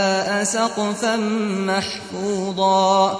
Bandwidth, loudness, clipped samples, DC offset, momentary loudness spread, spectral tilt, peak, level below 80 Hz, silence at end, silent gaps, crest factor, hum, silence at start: 11 kHz; -20 LUFS; under 0.1%; under 0.1%; 8 LU; -3.5 dB/octave; -4 dBFS; -60 dBFS; 0 s; none; 16 dB; none; 0 s